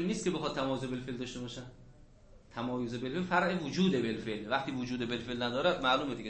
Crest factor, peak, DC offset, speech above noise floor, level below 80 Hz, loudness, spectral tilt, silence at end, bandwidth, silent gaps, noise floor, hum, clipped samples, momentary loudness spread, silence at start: 20 dB; -14 dBFS; under 0.1%; 24 dB; -58 dBFS; -34 LUFS; -5.5 dB/octave; 0 s; 8.4 kHz; none; -57 dBFS; none; under 0.1%; 10 LU; 0 s